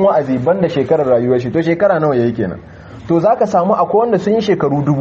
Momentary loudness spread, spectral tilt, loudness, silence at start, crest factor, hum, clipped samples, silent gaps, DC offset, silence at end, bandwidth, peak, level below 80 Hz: 5 LU; -8 dB/octave; -14 LUFS; 0 s; 12 dB; none; under 0.1%; none; under 0.1%; 0 s; 7.6 kHz; -2 dBFS; -48 dBFS